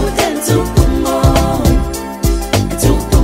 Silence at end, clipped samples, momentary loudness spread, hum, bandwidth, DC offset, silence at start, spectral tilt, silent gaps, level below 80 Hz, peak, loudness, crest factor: 0 s; under 0.1%; 5 LU; none; 16.5 kHz; under 0.1%; 0 s; -5.5 dB/octave; none; -16 dBFS; 0 dBFS; -14 LUFS; 12 dB